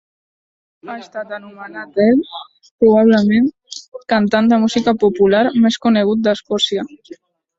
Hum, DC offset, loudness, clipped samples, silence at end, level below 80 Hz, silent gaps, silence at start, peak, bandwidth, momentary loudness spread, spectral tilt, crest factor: none; under 0.1%; -14 LUFS; under 0.1%; 0.7 s; -56 dBFS; 2.71-2.79 s, 3.88-3.92 s; 0.85 s; -2 dBFS; 7.8 kHz; 19 LU; -5.5 dB/octave; 14 dB